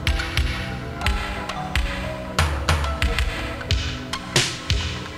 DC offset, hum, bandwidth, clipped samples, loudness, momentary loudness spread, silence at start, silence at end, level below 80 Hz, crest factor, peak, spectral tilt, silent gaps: under 0.1%; none; 15.5 kHz; under 0.1%; -24 LUFS; 7 LU; 0 s; 0 s; -28 dBFS; 20 dB; -4 dBFS; -4 dB/octave; none